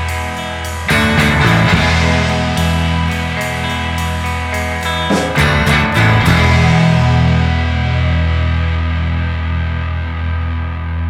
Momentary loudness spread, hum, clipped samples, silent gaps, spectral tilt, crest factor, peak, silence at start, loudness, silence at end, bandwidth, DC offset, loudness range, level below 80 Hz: 9 LU; none; under 0.1%; none; -5.5 dB/octave; 14 dB; 0 dBFS; 0 s; -14 LUFS; 0 s; 15.5 kHz; under 0.1%; 4 LU; -22 dBFS